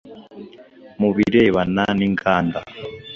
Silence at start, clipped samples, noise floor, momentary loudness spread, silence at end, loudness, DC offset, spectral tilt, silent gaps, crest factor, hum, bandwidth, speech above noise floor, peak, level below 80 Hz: 0.05 s; under 0.1%; -44 dBFS; 22 LU; 0 s; -19 LUFS; under 0.1%; -7.5 dB/octave; none; 18 dB; none; 7 kHz; 27 dB; -2 dBFS; -48 dBFS